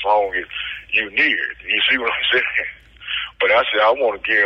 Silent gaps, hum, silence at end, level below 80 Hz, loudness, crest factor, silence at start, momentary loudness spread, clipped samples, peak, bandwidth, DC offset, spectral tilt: none; none; 0 s; -52 dBFS; -18 LUFS; 12 dB; 0 s; 10 LU; under 0.1%; -6 dBFS; 6.4 kHz; under 0.1%; -4 dB/octave